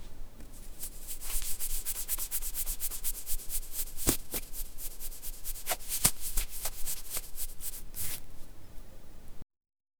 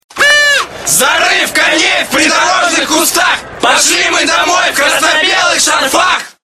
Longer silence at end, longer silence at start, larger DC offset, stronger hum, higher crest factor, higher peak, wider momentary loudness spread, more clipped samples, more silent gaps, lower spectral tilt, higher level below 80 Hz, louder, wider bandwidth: first, 0.55 s vs 0.15 s; second, 0 s vs 0.15 s; second, under 0.1% vs 0.4%; neither; first, 30 dB vs 10 dB; about the same, -2 dBFS vs 0 dBFS; first, 23 LU vs 3 LU; second, under 0.1% vs 0.1%; neither; first, -1.5 dB/octave vs 0 dB/octave; first, -40 dBFS vs -46 dBFS; second, -35 LUFS vs -8 LUFS; about the same, over 20 kHz vs over 20 kHz